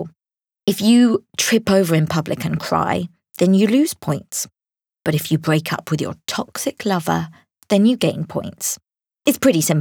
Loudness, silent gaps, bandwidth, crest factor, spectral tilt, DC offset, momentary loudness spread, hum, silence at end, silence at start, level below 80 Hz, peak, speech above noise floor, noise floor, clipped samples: -19 LUFS; none; over 20 kHz; 16 dB; -5 dB/octave; under 0.1%; 11 LU; none; 0 s; 0 s; -58 dBFS; -4 dBFS; 71 dB; -88 dBFS; under 0.1%